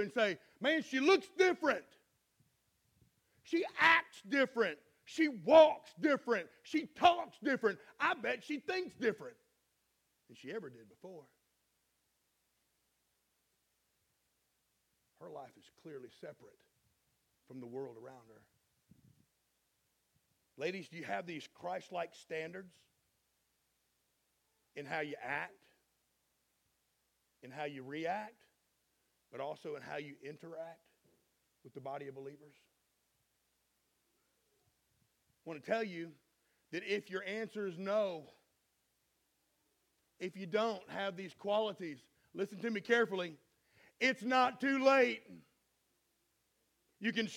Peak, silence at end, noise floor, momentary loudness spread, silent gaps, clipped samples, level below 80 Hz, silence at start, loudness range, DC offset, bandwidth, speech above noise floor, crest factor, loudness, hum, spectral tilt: -12 dBFS; 0 s; -81 dBFS; 22 LU; none; under 0.1%; -82 dBFS; 0 s; 23 LU; under 0.1%; 15.5 kHz; 45 dB; 28 dB; -35 LUFS; none; -4.5 dB/octave